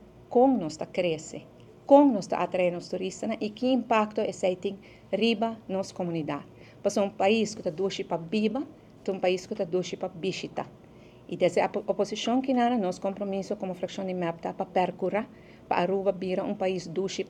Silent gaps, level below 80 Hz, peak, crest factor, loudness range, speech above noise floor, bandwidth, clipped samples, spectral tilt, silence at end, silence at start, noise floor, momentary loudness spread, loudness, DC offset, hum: none; -66 dBFS; -6 dBFS; 22 dB; 5 LU; 24 dB; 11 kHz; under 0.1%; -5.5 dB/octave; 0 s; 0.15 s; -51 dBFS; 11 LU; -28 LUFS; under 0.1%; none